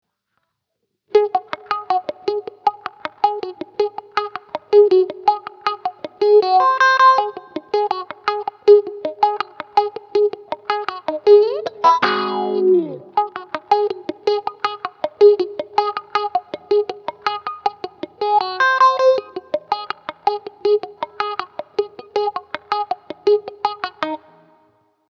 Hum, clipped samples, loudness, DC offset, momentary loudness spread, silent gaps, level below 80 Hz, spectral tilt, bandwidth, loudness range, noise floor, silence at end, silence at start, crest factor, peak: none; under 0.1%; -18 LUFS; under 0.1%; 14 LU; none; -72 dBFS; -4 dB/octave; 6.6 kHz; 8 LU; -75 dBFS; 1 s; 1.15 s; 18 dB; 0 dBFS